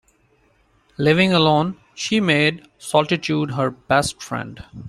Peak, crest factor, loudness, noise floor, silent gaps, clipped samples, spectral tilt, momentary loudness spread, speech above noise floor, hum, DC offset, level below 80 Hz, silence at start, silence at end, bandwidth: -2 dBFS; 18 dB; -19 LUFS; -60 dBFS; none; under 0.1%; -5 dB/octave; 14 LU; 40 dB; none; under 0.1%; -52 dBFS; 1 s; 0 s; 13 kHz